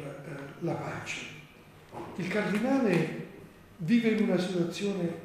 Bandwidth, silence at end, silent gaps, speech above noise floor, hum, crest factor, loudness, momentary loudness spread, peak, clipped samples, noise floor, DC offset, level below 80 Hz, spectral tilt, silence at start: 15 kHz; 0 s; none; 24 dB; none; 18 dB; -30 LUFS; 18 LU; -14 dBFS; under 0.1%; -53 dBFS; under 0.1%; -66 dBFS; -6.5 dB/octave; 0 s